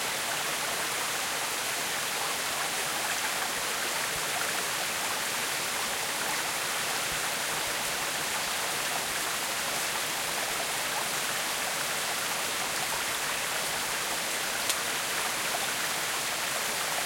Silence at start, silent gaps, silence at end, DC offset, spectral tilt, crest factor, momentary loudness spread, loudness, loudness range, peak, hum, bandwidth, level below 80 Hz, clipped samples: 0 s; none; 0 s; under 0.1%; 0 dB/octave; 26 dB; 1 LU; -29 LUFS; 0 LU; -6 dBFS; none; 16.5 kHz; -62 dBFS; under 0.1%